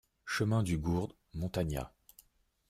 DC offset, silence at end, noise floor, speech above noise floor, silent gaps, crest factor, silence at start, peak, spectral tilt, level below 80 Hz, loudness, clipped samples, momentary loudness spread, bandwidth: under 0.1%; 0.8 s; -68 dBFS; 35 dB; none; 16 dB; 0.25 s; -20 dBFS; -6 dB/octave; -52 dBFS; -35 LUFS; under 0.1%; 10 LU; 15 kHz